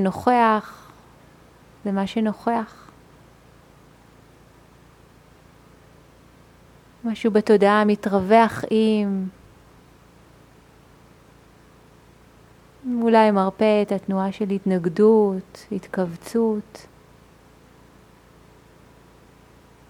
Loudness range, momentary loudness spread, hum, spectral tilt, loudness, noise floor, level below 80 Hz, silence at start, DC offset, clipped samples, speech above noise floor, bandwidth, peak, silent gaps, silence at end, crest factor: 11 LU; 16 LU; none; -7 dB/octave; -21 LUFS; -51 dBFS; -58 dBFS; 0 s; under 0.1%; under 0.1%; 31 dB; 13 kHz; -4 dBFS; none; 3.15 s; 20 dB